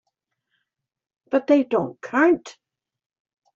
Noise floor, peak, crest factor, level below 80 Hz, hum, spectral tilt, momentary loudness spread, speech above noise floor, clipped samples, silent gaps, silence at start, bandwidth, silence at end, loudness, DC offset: -78 dBFS; -6 dBFS; 18 dB; -70 dBFS; none; -6 dB/octave; 6 LU; 58 dB; under 0.1%; none; 1.3 s; 7.6 kHz; 1.05 s; -21 LUFS; under 0.1%